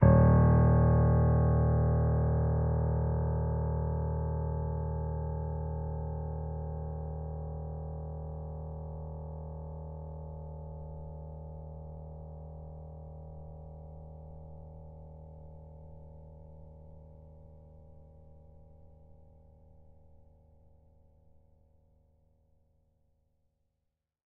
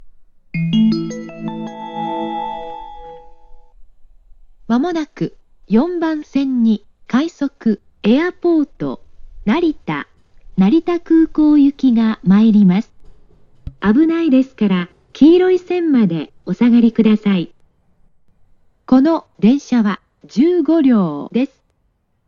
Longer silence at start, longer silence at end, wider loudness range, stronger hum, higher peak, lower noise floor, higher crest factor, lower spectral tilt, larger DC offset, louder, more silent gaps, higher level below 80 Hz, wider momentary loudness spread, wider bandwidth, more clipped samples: about the same, 0 s vs 0.05 s; first, 5.05 s vs 0.8 s; first, 24 LU vs 9 LU; neither; second, -10 dBFS vs 0 dBFS; first, -84 dBFS vs -63 dBFS; first, 22 dB vs 16 dB; about the same, -8.5 dB/octave vs -8 dB/octave; neither; second, -31 LUFS vs -15 LUFS; neither; first, -40 dBFS vs -46 dBFS; first, 25 LU vs 15 LU; second, 2.3 kHz vs 7.2 kHz; neither